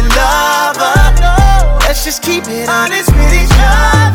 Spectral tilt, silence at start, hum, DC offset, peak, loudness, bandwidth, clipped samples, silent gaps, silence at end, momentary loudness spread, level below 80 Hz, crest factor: -4 dB/octave; 0 s; none; under 0.1%; 0 dBFS; -10 LUFS; 17.5 kHz; 0.3%; none; 0 s; 5 LU; -10 dBFS; 8 dB